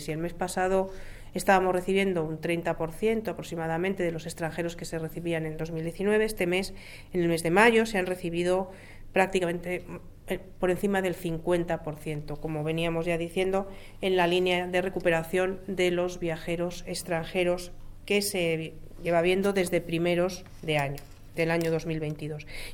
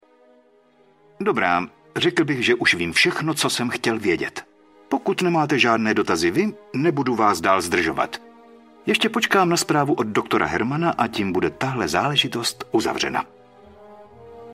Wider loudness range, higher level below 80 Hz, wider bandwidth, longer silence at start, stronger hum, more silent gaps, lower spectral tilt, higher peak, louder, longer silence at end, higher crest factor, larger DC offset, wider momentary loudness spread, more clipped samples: about the same, 4 LU vs 2 LU; first, -46 dBFS vs -56 dBFS; first, 18 kHz vs 16 kHz; second, 0 s vs 1.2 s; neither; neither; about the same, -5 dB/octave vs -4 dB/octave; about the same, -6 dBFS vs -4 dBFS; second, -28 LUFS vs -21 LUFS; about the same, 0 s vs 0 s; about the same, 22 dB vs 18 dB; neither; first, 12 LU vs 8 LU; neither